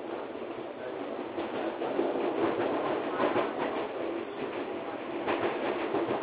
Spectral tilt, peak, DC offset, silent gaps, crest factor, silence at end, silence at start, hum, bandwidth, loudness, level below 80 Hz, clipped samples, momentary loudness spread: -3.5 dB/octave; -16 dBFS; under 0.1%; none; 16 dB; 0 s; 0 s; none; 4 kHz; -33 LUFS; -70 dBFS; under 0.1%; 9 LU